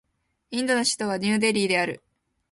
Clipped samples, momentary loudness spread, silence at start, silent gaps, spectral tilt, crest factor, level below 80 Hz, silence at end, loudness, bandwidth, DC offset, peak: under 0.1%; 9 LU; 0.5 s; none; -3.5 dB/octave; 18 dB; -66 dBFS; 0.55 s; -24 LUFS; 11.5 kHz; under 0.1%; -8 dBFS